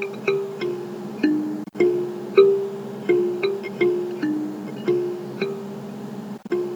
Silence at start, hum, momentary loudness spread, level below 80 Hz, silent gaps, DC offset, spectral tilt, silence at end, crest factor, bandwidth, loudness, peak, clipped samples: 0 s; none; 14 LU; -74 dBFS; none; under 0.1%; -7 dB/octave; 0 s; 20 dB; 19.5 kHz; -23 LUFS; -4 dBFS; under 0.1%